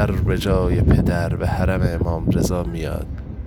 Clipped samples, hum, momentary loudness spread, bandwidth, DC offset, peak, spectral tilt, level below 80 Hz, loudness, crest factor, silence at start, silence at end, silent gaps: under 0.1%; none; 10 LU; 18.5 kHz; under 0.1%; -4 dBFS; -7.5 dB/octave; -26 dBFS; -20 LUFS; 16 dB; 0 s; 0 s; none